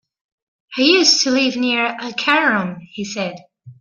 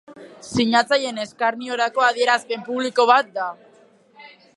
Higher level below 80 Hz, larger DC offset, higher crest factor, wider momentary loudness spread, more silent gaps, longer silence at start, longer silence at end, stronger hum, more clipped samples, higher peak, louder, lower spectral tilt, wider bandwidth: second, -66 dBFS vs -60 dBFS; neither; about the same, 18 dB vs 20 dB; first, 15 LU vs 11 LU; neither; first, 0.7 s vs 0.1 s; second, 0.1 s vs 0.3 s; neither; neither; about the same, -2 dBFS vs -2 dBFS; first, -15 LUFS vs -20 LUFS; about the same, -2.5 dB/octave vs -3.5 dB/octave; about the same, 11 kHz vs 11.5 kHz